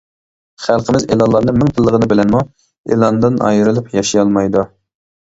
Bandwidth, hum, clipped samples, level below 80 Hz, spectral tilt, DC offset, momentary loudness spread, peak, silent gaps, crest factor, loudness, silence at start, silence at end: 8 kHz; none; under 0.1%; -40 dBFS; -6.5 dB/octave; under 0.1%; 6 LU; 0 dBFS; 2.78-2.84 s; 14 dB; -13 LUFS; 0.6 s; 0.55 s